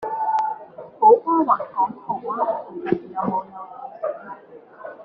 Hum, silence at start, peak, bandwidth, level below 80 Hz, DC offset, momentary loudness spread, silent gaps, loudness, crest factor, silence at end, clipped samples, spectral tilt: none; 0 s; -4 dBFS; 6.6 kHz; -68 dBFS; under 0.1%; 23 LU; none; -22 LUFS; 20 dB; 0 s; under 0.1%; -6.5 dB/octave